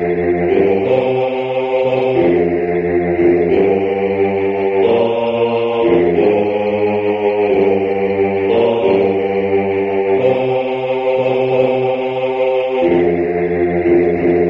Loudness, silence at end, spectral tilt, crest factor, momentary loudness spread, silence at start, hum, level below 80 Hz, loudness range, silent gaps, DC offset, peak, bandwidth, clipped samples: -15 LUFS; 0 s; -9 dB/octave; 14 dB; 3 LU; 0 s; none; -46 dBFS; 1 LU; none; under 0.1%; 0 dBFS; 5.6 kHz; under 0.1%